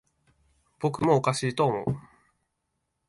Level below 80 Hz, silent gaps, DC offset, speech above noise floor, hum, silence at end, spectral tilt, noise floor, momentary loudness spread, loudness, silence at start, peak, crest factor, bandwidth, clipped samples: -60 dBFS; none; under 0.1%; 54 dB; none; 1.1 s; -6 dB/octave; -79 dBFS; 9 LU; -27 LUFS; 0.8 s; -8 dBFS; 20 dB; 11.5 kHz; under 0.1%